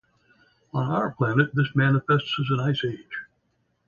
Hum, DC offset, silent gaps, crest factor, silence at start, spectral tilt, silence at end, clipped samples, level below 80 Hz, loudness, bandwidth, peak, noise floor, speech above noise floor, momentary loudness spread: none; under 0.1%; none; 18 dB; 0.75 s; -8 dB/octave; 0.65 s; under 0.1%; -60 dBFS; -24 LUFS; 7 kHz; -6 dBFS; -71 dBFS; 47 dB; 12 LU